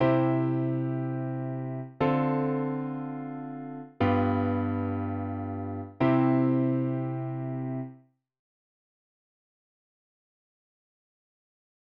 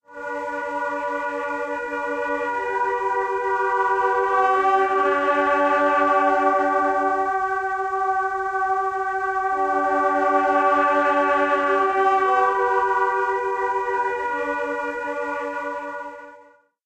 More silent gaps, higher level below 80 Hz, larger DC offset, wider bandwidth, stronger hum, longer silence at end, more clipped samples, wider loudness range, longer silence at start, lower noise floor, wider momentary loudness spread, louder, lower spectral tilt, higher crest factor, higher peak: neither; about the same, -64 dBFS vs -60 dBFS; neither; second, 5 kHz vs 12 kHz; neither; first, 3.9 s vs 0.45 s; neither; first, 10 LU vs 6 LU; about the same, 0 s vs 0.1 s; about the same, -55 dBFS vs -52 dBFS; first, 13 LU vs 9 LU; second, -29 LUFS vs -21 LUFS; first, -11 dB/octave vs -4 dB/octave; about the same, 18 dB vs 14 dB; second, -12 dBFS vs -6 dBFS